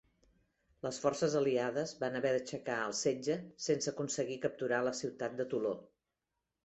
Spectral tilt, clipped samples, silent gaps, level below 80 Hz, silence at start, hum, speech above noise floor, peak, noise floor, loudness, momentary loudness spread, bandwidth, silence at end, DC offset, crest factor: -4 dB/octave; under 0.1%; none; -74 dBFS; 0.85 s; none; 53 dB; -18 dBFS; -88 dBFS; -36 LUFS; 7 LU; 8.2 kHz; 0.8 s; under 0.1%; 18 dB